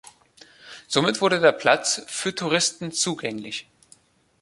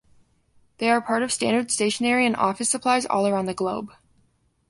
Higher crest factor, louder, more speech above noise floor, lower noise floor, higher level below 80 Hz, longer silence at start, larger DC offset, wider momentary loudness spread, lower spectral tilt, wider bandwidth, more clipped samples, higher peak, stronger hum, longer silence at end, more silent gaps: about the same, 22 dB vs 18 dB; about the same, -22 LUFS vs -23 LUFS; second, 34 dB vs 42 dB; second, -57 dBFS vs -65 dBFS; about the same, -68 dBFS vs -64 dBFS; second, 0.65 s vs 0.8 s; neither; first, 15 LU vs 7 LU; about the same, -2.5 dB/octave vs -3 dB/octave; about the same, 11.5 kHz vs 11.5 kHz; neither; first, -2 dBFS vs -6 dBFS; neither; about the same, 0.8 s vs 0.8 s; neither